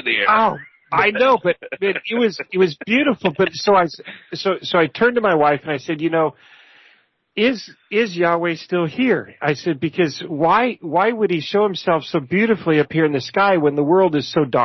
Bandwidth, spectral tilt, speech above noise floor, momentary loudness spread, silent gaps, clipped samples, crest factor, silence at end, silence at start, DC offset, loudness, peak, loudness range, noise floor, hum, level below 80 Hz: 6.2 kHz; -6 dB/octave; 38 dB; 7 LU; none; under 0.1%; 14 dB; 0 s; 0.05 s; under 0.1%; -18 LUFS; -4 dBFS; 3 LU; -56 dBFS; none; -60 dBFS